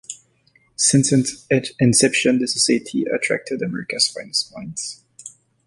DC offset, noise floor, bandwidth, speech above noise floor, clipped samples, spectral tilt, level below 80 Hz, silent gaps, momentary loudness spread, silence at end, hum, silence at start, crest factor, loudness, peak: under 0.1%; -59 dBFS; 11.5 kHz; 40 dB; under 0.1%; -3.5 dB/octave; -58 dBFS; none; 22 LU; 0.4 s; none; 0.1 s; 18 dB; -19 LUFS; -2 dBFS